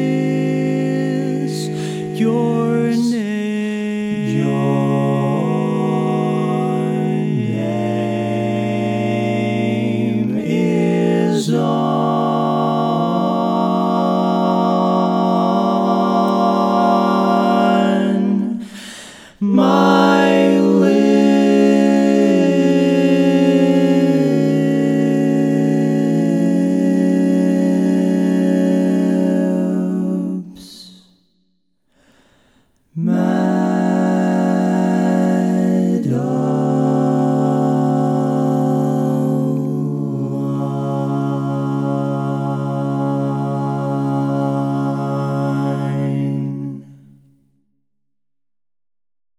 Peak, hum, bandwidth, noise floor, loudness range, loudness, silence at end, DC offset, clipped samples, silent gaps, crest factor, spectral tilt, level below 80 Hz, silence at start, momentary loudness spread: -2 dBFS; none; 12.5 kHz; -89 dBFS; 7 LU; -17 LUFS; 2.45 s; under 0.1%; under 0.1%; none; 14 dB; -7.5 dB/octave; -64 dBFS; 0 s; 8 LU